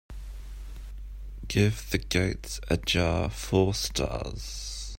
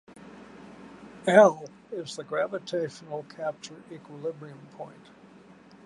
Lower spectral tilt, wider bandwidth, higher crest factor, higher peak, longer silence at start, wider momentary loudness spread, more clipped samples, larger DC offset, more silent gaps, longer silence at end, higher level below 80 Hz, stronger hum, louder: about the same, -4.5 dB/octave vs -5 dB/octave; first, 16.5 kHz vs 11.5 kHz; about the same, 20 dB vs 24 dB; about the same, -8 dBFS vs -6 dBFS; second, 0.1 s vs 0.8 s; second, 18 LU vs 28 LU; neither; neither; neither; second, 0 s vs 0.95 s; first, -38 dBFS vs -74 dBFS; neither; about the same, -28 LUFS vs -26 LUFS